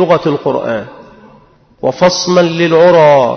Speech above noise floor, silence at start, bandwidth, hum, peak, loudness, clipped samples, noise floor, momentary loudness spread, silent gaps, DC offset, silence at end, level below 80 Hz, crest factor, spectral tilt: 35 dB; 0 s; 6.6 kHz; none; 0 dBFS; -10 LUFS; under 0.1%; -44 dBFS; 13 LU; none; under 0.1%; 0 s; -48 dBFS; 10 dB; -5 dB/octave